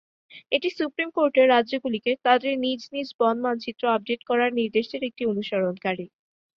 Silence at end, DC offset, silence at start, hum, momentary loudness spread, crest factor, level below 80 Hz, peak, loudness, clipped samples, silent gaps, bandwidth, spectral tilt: 0.5 s; under 0.1%; 0.35 s; none; 10 LU; 20 dB; -70 dBFS; -4 dBFS; -24 LUFS; under 0.1%; 3.14-3.19 s; 6.8 kHz; -6 dB/octave